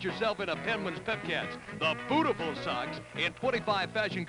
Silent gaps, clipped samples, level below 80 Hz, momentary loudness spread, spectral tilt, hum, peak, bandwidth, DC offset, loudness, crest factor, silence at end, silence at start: none; under 0.1%; -62 dBFS; 5 LU; -5 dB/octave; none; -16 dBFS; 11 kHz; under 0.1%; -32 LUFS; 16 dB; 0 s; 0 s